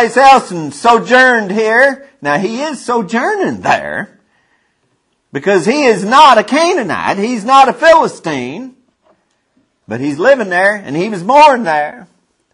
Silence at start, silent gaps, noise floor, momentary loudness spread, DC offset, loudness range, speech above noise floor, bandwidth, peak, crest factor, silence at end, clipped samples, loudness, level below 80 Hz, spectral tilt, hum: 0 s; none; -62 dBFS; 14 LU; under 0.1%; 7 LU; 51 dB; 11 kHz; 0 dBFS; 12 dB; 0.5 s; 0.4%; -10 LUFS; -54 dBFS; -4 dB/octave; none